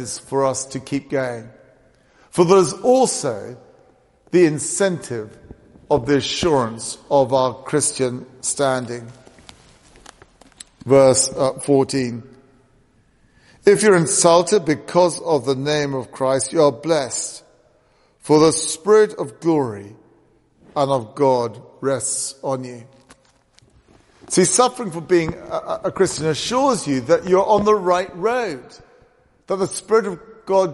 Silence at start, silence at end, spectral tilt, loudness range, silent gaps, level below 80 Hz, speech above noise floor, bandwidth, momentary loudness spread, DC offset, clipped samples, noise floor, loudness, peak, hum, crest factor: 0 s; 0 s; -4 dB/octave; 5 LU; none; -54 dBFS; 40 dB; 11.5 kHz; 13 LU; under 0.1%; under 0.1%; -58 dBFS; -18 LUFS; 0 dBFS; none; 18 dB